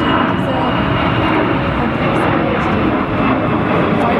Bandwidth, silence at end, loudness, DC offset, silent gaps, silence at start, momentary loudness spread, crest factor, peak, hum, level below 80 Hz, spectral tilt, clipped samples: 11.5 kHz; 0 s; -15 LUFS; under 0.1%; none; 0 s; 2 LU; 12 dB; -2 dBFS; none; -32 dBFS; -8 dB/octave; under 0.1%